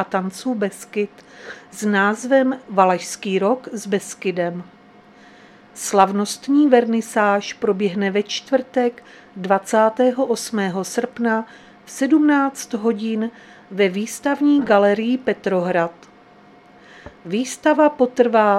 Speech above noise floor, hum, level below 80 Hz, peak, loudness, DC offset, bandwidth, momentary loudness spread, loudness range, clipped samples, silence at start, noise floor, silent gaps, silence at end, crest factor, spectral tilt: 29 dB; none; -66 dBFS; 0 dBFS; -19 LUFS; under 0.1%; 15 kHz; 11 LU; 3 LU; under 0.1%; 0 s; -48 dBFS; none; 0 s; 20 dB; -5 dB/octave